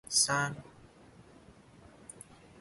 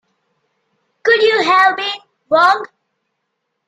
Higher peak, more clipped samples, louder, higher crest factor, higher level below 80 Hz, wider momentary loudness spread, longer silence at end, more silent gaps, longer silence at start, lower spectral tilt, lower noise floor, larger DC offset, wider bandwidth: second, -14 dBFS vs 0 dBFS; neither; second, -29 LUFS vs -13 LUFS; first, 24 dB vs 16 dB; about the same, -66 dBFS vs -64 dBFS; first, 26 LU vs 12 LU; second, 0.4 s vs 1 s; neither; second, 0.1 s vs 1.05 s; about the same, -1.5 dB/octave vs -2.5 dB/octave; second, -57 dBFS vs -73 dBFS; neither; first, 12 kHz vs 10 kHz